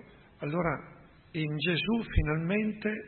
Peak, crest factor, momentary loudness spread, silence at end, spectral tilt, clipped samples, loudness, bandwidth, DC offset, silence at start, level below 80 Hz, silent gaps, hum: -12 dBFS; 20 dB; 9 LU; 0 s; -10.5 dB/octave; under 0.1%; -31 LUFS; 4.4 kHz; under 0.1%; 0.05 s; -42 dBFS; none; none